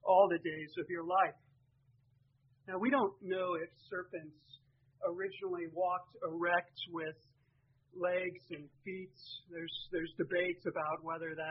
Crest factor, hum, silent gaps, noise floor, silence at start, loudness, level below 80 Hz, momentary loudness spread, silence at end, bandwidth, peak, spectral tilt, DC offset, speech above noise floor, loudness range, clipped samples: 22 dB; none; none; -73 dBFS; 0.05 s; -37 LUFS; -76 dBFS; 15 LU; 0 s; 5.8 kHz; -16 dBFS; -3 dB/octave; under 0.1%; 35 dB; 3 LU; under 0.1%